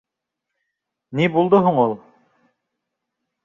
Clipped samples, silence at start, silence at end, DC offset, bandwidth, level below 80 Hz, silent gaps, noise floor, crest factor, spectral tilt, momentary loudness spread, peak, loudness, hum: under 0.1%; 1.1 s; 1.45 s; under 0.1%; 7.2 kHz; -64 dBFS; none; -82 dBFS; 18 dB; -8.5 dB/octave; 14 LU; -4 dBFS; -18 LUFS; none